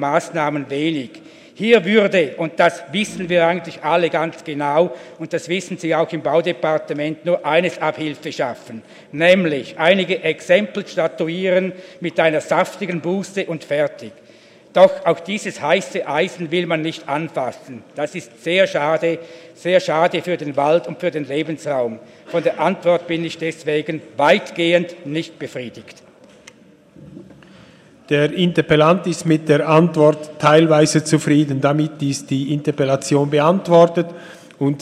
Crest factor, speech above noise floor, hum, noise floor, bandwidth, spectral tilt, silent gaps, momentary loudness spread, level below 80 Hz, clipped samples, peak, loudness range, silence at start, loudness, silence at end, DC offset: 18 dB; 30 dB; none; -47 dBFS; 13 kHz; -5.5 dB/octave; none; 12 LU; -62 dBFS; under 0.1%; 0 dBFS; 6 LU; 0 s; -18 LUFS; 0 s; under 0.1%